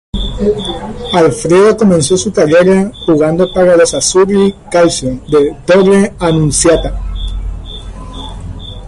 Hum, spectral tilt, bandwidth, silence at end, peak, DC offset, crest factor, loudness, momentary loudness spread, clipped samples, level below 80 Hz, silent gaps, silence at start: none; -5 dB/octave; 11.5 kHz; 0 s; 0 dBFS; under 0.1%; 10 dB; -10 LUFS; 18 LU; under 0.1%; -26 dBFS; none; 0.15 s